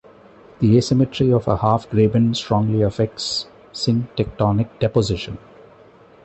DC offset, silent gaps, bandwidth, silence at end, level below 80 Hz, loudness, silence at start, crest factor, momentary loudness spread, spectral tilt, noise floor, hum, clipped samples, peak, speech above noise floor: under 0.1%; none; 8.4 kHz; 0.85 s; -42 dBFS; -19 LUFS; 0.6 s; 16 dB; 9 LU; -7 dB/octave; -48 dBFS; none; under 0.1%; -4 dBFS; 29 dB